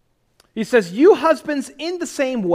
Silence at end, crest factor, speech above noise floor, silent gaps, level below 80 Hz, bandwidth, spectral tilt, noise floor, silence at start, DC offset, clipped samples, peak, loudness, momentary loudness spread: 0 s; 16 dB; 42 dB; none; -60 dBFS; 15.5 kHz; -5 dB/octave; -60 dBFS; 0.55 s; under 0.1%; under 0.1%; -2 dBFS; -18 LUFS; 14 LU